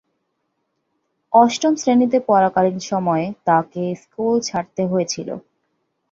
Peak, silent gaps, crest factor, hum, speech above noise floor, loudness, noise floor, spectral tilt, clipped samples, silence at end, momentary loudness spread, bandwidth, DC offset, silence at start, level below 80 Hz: -2 dBFS; none; 18 dB; none; 55 dB; -18 LUFS; -72 dBFS; -5.5 dB/octave; under 0.1%; 0.7 s; 11 LU; 7.8 kHz; under 0.1%; 1.3 s; -62 dBFS